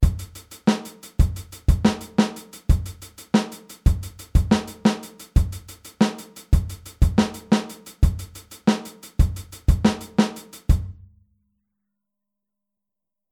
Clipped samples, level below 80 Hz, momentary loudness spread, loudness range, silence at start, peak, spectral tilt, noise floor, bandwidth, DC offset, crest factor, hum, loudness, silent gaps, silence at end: under 0.1%; -26 dBFS; 15 LU; 2 LU; 0 s; -4 dBFS; -6.5 dB/octave; -87 dBFS; 18 kHz; under 0.1%; 18 dB; none; -23 LUFS; none; 2.4 s